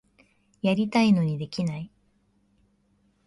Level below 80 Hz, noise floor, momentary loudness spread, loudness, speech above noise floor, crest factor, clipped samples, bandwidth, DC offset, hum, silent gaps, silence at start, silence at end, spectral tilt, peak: -62 dBFS; -67 dBFS; 14 LU; -25 LUFS; 43 dB; 18 dB; under 0.1%; 11.5 kHz; under 0.1%; none; none; 0.65 s; 1.4 s; -7 dB/octave; -10 dBFS